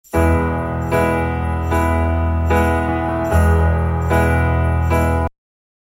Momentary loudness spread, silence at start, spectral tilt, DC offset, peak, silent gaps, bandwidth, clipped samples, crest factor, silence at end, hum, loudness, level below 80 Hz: 5 LU; 0.15 s; -7.5 dB/octave; under 0.1%; -2 dBFS; none; 15 kHz; under 0.1%; 14 dB; 0.7 s; none; -17 LUFS; -24 dBFS